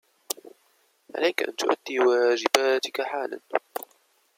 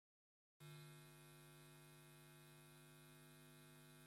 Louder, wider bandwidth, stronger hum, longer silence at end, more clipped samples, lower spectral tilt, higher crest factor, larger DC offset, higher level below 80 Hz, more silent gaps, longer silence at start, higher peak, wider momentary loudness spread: first, -25 LUFS vs -64 LUFS; about the same, 16.5 kHz vs 16.5 kHz; neither; first, 0.55 s vs 0 s; neither; second, -1 dB/octave vs -4 dB/octave; first, 26 dB vs 16 dB; neither; about the same, -82 dBFS vs -86 dBFS; neither; second, 0.45 s vs 0.6 s; first, 0 dBFS vs -48 dBFS; first, 15 LU vs 4 LU